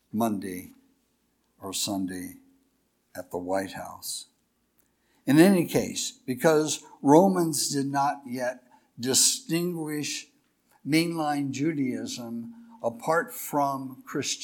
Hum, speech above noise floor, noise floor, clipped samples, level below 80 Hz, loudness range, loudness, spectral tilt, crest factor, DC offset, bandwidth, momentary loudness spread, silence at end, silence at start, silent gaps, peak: none; 45 dB; -71 dBFS; under 0.1%; -68 dBFS; 11 LU; -26 LUFS; -4 dB/octave; 22 dB; under 0.1%; 19 kHz; 17 LU; 0 s; 0.15 s; none; -4 dBFS